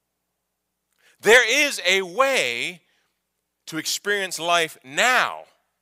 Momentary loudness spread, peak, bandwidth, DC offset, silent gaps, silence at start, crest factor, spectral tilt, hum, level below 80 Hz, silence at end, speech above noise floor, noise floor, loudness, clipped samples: 13 LU; -2 dBFS; 16 kHz; under 0.1%; none; 1.25 s; 20 dB; -1 dB/octave; none; -66 dBFS; 0.4 s; 57 dB; -78 dBFS; -20 LUFS; under 0.1%